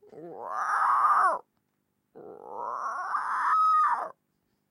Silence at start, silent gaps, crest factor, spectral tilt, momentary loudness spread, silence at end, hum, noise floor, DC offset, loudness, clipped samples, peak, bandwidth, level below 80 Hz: 0.15 s; none; 16 dB; -2.5 dB/octave; 19 LU; 0.6 s; none; -77 dBFS; under 0.1%; -26 LUFS; under 0.1%; -14 dBFS; 12.5 kHz; under -90 dBFS